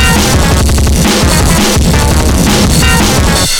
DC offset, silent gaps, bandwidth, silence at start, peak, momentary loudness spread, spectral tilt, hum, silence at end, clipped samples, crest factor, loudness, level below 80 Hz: under 0.1%; none; 18 kHz; 0 s; 0 dBFS; 2 LU; -4 dB/octave; none; 0 s; 0.1%; 8 dB; -8 LUFS; -12 dBFS